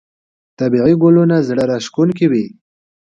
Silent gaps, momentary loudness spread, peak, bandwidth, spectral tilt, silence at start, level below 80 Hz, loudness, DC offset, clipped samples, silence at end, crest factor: none; 9 LU; 0 dBFS; 7.6 kHz; -8 dB/octave; 0.6 s; -52 dBFS; -14 LUFS; under 0.1%; under 0.1%; 0.55 s; 14 dB